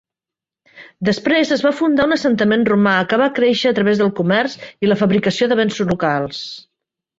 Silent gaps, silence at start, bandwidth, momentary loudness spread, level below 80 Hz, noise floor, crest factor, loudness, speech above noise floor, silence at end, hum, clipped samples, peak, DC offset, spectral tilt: none; 0.75 s; 7.8 kHz; 7 LU; -54 dBFS; -88 dBFS; 16 dB; -16 LUFS; 72 dB; 0.6 s; none; under 0.1%; -2 dBFS; under 0.1%; -6 dB/octave